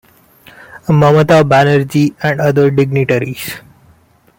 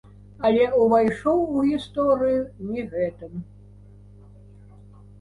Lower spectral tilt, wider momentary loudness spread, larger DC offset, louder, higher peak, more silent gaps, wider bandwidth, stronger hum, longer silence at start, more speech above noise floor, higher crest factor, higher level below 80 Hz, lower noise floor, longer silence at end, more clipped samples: about the same, -7 dB/octave vs -7.5 dB/octave; first, 15 LU vs 12 LU; neither; first, -11 LUFS vs -22 LUFS; first, 0 dBFS vs -8 dBFS; neither; first, 17 kHz vs 11 kHz; second, none vs 50 Hz at -45 dBFS; first, 0.75 s vs 0.4 s; first, 38 dB vs 25 dB; about the same, 12 dB vs 16 dB; about the same, -46 dBFS vs -50 dBFS; about the same, -49 dBFS vs -47 dBFS; second, 0.8 s vs 1.75 s; neither